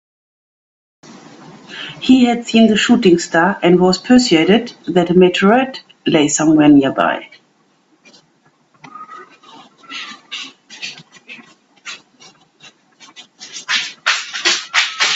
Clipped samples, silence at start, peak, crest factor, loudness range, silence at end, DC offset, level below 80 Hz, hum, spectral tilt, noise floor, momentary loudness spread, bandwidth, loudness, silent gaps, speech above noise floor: under 0.1%; 1.7 s; 0 dBFS; 16 dB; 20 LU; 0 s; under 0.1%; -54 dBFS; none; -4 dB/octave; -57 dBFS; 22 LU; 8.2 kHz; -13 LUFS; none; 45 dB